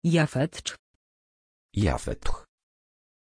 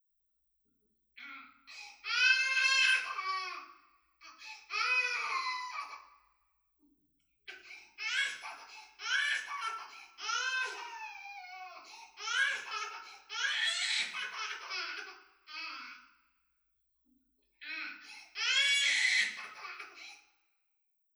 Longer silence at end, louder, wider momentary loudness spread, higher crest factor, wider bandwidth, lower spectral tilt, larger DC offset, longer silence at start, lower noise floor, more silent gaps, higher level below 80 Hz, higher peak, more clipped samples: about the same, 0.95 s vs 0.95 s; first, -29 LUFS vs -32 LUFS; second, 16 LU vs 23 LU; about the same, 20 dB vs 24 dB; second, 10.5 kHz vs over 20 kHz; first, -6 dB/octave vs 4 dB/octave; neither; second, 0.05 s vs 1.15 s; first, under -90 dBFS vs -79 dBFS; first, 0.79-1.69 s vs none; first, -38 dBFS vs -88 dBFS; first, -8 dBFS vs -14 dBFS; neither